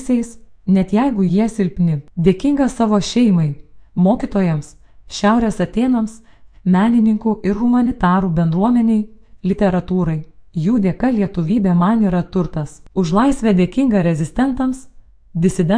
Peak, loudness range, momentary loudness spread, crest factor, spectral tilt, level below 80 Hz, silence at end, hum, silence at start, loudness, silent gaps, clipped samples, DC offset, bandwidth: 0 dBFS; 2 LU; 10 LU; 16 dB; -7.5 dB/octave; -36 dBFS; 0 s; none; 0 s; -17 LUFS; none; under 0.1%; under 0.1%; 10.5 kHz